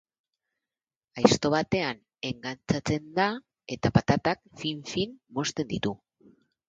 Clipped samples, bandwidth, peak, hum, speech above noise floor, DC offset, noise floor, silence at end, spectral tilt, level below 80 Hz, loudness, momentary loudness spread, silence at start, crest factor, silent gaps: under 0.1%; 9.2 kHz; -4 dBFS; none; over 63 dB; under 0.1%; under -90 dBFS; 0.7 s; -5 dB/octave; -54 dBFS; -28 LUFS; 12 LU; 1.15 s; 26 dB; none